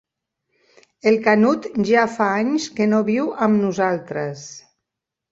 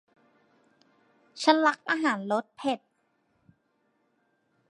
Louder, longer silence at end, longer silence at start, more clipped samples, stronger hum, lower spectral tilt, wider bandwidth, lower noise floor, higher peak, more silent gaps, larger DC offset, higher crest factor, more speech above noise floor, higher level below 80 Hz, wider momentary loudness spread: first, -19 LUFS vs -27 LUFS; second, 0.7 s vs 1.9 s; second, 1.05 s vs 1.35 s; neither; neither; first, -6 dB/octave vs -4 dB/octave; second, 7.8 kHz vs 11.5 kHz; first, -84 dBFS vs -73 dBFS; about the same, -2 dBFS vs -4 dBFS; neither; neither; second, 18 dB vs 26 dB; first, 65 dB vs 47 dB; first, -64 dBFS vs -84 dBFS; about the same, 11 LU vs 10 LU